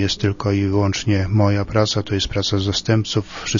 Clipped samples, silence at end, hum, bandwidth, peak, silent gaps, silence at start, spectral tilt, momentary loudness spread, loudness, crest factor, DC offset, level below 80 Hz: under 0.1%; 0 s; none; 7.4 kHz; -2 dBFS; none; 0 s; -5.5 dB/octave; 3 LU; -19 LUFS; 16 dB; under 0.1%; -40 dBFS